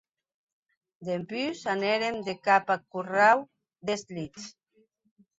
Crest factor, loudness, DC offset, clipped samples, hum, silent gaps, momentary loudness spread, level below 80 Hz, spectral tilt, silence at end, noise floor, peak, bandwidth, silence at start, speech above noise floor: 20 dB; -27 LUFS; under 0.1%; under 0.1%; none; none; 17 LU; -72 dBFS; -4.5 dB/octave; 0.9 s; -68 dBFS; -8 dBFS; 8 kHz; 1 s; 41 dB